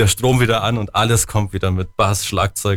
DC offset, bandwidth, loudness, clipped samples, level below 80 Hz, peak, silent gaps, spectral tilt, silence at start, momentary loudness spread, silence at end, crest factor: under 0.1%; 18.5 kHz; -17 LUFS; under 0.1%; -36 dBFS; -4 dBFS; none; -4.5 dB/octave; 0 s; 5 LU; 0 s; 12 dB